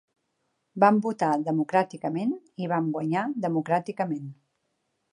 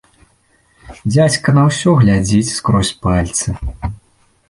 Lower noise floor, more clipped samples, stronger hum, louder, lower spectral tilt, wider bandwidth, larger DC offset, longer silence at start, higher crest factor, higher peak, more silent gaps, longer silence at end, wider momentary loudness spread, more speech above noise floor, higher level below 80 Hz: first, -76 dBFS vs -56 dBFS; neither; neither; second, -26 LUFS vs -14 LUFS; first, -8 dB/octave vs -5.5 dB/octave; about the same, 11 kHz vs 11.5 kHz; neither; about the same, 0.75 s vs 0.85 s; first, 22 dB vs 14 dB; second, -6 dBFS vs -2 dBFS; neither; first, 0.8 s vs 0.55 s; second, 10 LU vs 13 LU; first, 51 dB vs 42 dB; second, -78 dBFS vs -32 dBFS